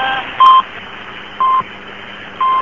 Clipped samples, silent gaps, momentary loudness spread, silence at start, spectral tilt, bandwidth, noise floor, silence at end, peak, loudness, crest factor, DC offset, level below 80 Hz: under 0.1%; none; 21 LU; 0 s; -3.5 dB/octave; 7 kHz; -31 dBFS; 0 s; 0 dBFS; -12 LUFS; 14 dB; 0.7%; -52 dBFS